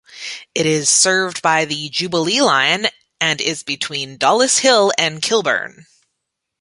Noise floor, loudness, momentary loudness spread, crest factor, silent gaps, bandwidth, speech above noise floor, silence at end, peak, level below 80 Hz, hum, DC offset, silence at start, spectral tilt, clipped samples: -77 dBFS; -16 LUFS; 10 LU; 18 dB; none; 11.5 kHz; 60 dB; 0.8 s; 0 dBFS; -64 dBFS; none; under 0.1%; 0.1 s; -2 dB/octave; under 0.1%